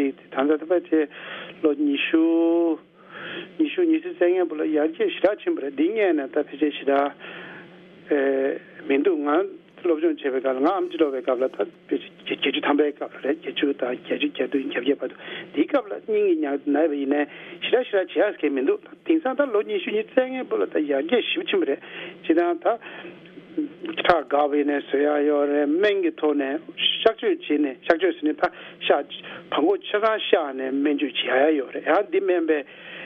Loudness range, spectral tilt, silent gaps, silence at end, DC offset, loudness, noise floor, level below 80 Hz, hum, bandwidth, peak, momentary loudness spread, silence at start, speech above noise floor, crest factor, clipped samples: 3 LU; -6.5 dB/octave; none; 0 s; under 0.1%; -23 LUFS; -46 dBFS; -68 dBFS; none; 5.4 kHz; -2 dBFS; 10 LU; 0 s; 23 dB; 22 dB; under 0.1%